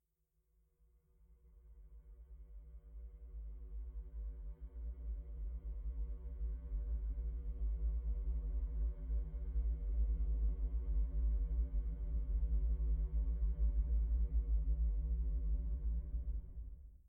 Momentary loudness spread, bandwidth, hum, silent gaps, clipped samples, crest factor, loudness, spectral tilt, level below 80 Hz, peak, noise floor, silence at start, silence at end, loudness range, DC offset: 16 LU; 1.2 kHz; none; none; under 0.1%; 12 dB; -42 LUFS; -11.5 dB/octave; -38 dBFS; -26 dBFS; -82 dBFS; 1.3 s; 0.1 s; 15 LU; under 0.1%